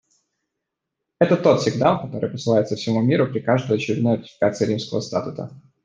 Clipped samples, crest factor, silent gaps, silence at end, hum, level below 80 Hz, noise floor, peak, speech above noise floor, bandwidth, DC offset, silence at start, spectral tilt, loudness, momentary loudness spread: under 0.1%; 20 dB; none; 0.25 s; none; -62 dBFS; -81 dBFS; -2 dBFS; 61 dB; 9.6 kHz; under 0.1%; 1.2 s; -6.5 dB/octave; -21 LUFS; 9 LU